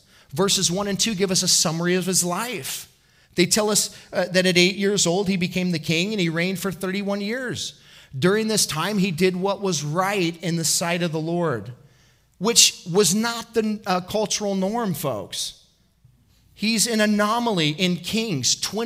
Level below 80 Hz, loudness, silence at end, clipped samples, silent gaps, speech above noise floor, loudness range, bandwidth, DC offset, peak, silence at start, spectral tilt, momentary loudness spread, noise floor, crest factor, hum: -60 dBFS; -21 LUFS; 0 s; under 0.1%; none; 36 dB; 4 LU; 16 kHz; under 0.1%; 0 dBFS; 0.3 s; -3 dB/octave; 9 LU; -58 dBFS; 22 dB; none